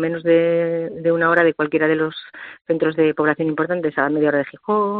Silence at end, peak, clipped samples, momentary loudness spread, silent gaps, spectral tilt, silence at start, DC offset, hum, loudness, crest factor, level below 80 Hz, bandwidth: 0 s; -2 dBFS; under 0.1%; 8 LU; 2.61-2.65 s; -5 dB/octave; 0 s; under 0.1%; none; -19 LUFS; 16 dB; -64 dBFS; 4.6 kHz